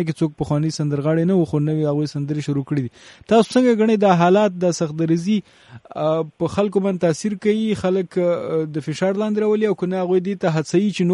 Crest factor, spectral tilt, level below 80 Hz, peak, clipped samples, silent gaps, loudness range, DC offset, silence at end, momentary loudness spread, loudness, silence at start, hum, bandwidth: 16 dB; -7 dB/octave; -56 dBFS; -2 dBFS; under 0.1%; none; 3 LU; under 0.1%; 0 s; 8 LU; -19 LUFS; 0 s; none; 11.5 kHz